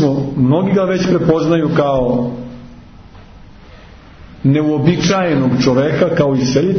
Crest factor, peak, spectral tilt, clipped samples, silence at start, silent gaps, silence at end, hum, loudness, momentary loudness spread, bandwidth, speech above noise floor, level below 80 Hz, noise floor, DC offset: 14 dB; -2 dBFS; -7 dB/octave; under 0.1%; 0 s; none; 0 s; none; -14 LUFS; 4 LU; 6.6 kHz; 25 dB; -40 dBFS; -38 dBFS; under 0.1%